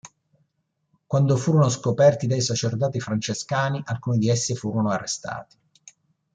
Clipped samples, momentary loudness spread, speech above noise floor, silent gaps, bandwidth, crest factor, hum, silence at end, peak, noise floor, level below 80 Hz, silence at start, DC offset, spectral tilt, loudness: under 0.1%; 9 LU; 52 dB; none; 9.4 kHz; 18 dB; none; 0.9 s; -4 dBFS; -74 dBFS; -62 dBFS; 0.05 s; under 0.1%; -5.5 dB/octave; -23 LUFS